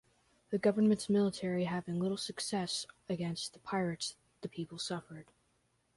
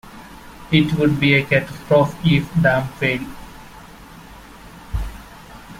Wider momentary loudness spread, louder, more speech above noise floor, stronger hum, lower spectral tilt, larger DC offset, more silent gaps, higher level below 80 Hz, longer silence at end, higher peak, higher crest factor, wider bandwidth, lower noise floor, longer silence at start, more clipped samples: second, 13 LU vs 24 LU; second, -35 LUFS vs -18 LUFS; first, 41 dB vs 23 dB; neither; second, -5 dB/octave vs -7 dB/octave; neither; neither; second, -72 dBFS vs -38 dBFS; first, 0.75 s vs 0 s; second, -18 dBFS vs -2 dBFS; about the same, 18 dB vs 18 dB; second, 11.5 kHz vs 16 kHz; first, -76 dBFS vs -40 dBFS; first, 0.5 s vs 0.05 s; neither